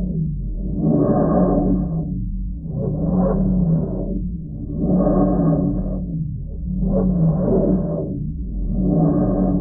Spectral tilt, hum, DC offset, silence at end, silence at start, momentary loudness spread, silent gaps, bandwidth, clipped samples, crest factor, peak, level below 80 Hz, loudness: -17 dB/octave; none; under 0.1%; 0 s; 0 s; 10 LU; none; 1.9 kHz; under 0.1%; 14 dB; -4 dBFS; -28 dBFS; -20 LUFS